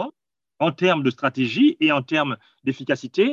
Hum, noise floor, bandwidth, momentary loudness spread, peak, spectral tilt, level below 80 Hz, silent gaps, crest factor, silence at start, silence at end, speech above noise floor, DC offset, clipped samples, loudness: none; -73 dBFS; 7.4 kHz; 10 LU; -4 dBFS; -6.5 dB/octave; -70 dBFS; none; 16 dB; 0 s; 0 s; 52 dB; under 0.1%; under 0.1%; -21 LUFS